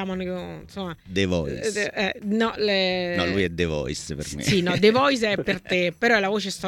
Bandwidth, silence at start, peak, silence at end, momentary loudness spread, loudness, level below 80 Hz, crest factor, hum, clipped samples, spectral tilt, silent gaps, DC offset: 17 kHz; 0 s; -6 dBFS; 0 s; 12 LU; -23 LUFS; -46 dBFS; 18 dB; none; under 0.1%; -4.5 dB/octave; none; under 0.1%